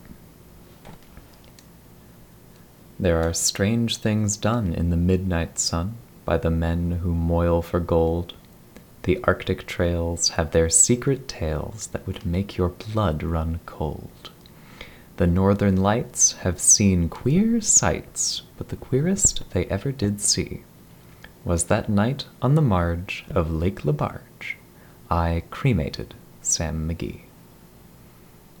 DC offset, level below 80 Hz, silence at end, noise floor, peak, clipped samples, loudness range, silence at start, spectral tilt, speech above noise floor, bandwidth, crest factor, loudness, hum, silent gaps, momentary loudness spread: under 0.1%; -38 dBFS; 1.4 s; -49 dBFS; -4 dBFS; under 0.1%; 8 LU; 0.05 s; -4.5 dB/octave; 27 dB; 19.5 kHz; 20 dB; -22 LUFS; none; none; 15 LU